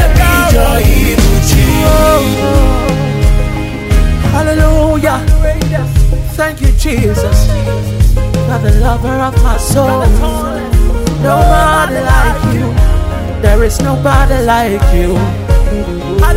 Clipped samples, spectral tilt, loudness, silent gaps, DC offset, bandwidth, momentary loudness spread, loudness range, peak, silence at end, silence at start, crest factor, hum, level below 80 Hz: 0.4%; -6 dB/octave; -11 LUFS; none; under 0.1%; 16.5 kHz; 5 LU; 2 LU; 0 dBFS; 0 s; 0 s; 8 dB; none; -12 dBFS